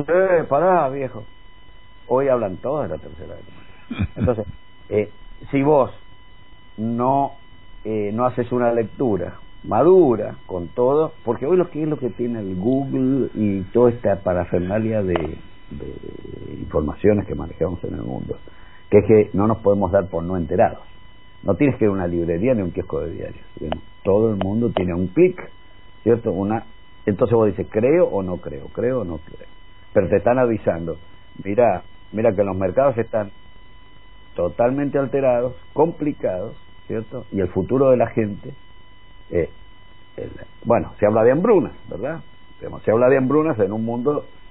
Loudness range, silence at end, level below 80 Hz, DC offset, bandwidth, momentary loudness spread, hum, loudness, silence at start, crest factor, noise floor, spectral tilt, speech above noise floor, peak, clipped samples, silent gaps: 4 LU; 0.25 s; -44 dBFS; 1%; 4 kHz; 17 LU; none; -20 LUFS; 0 s; 20 dB; -48 dBFS; -12.5 dB/octave; 28 dB; -2 dBFS; under 0.1%; none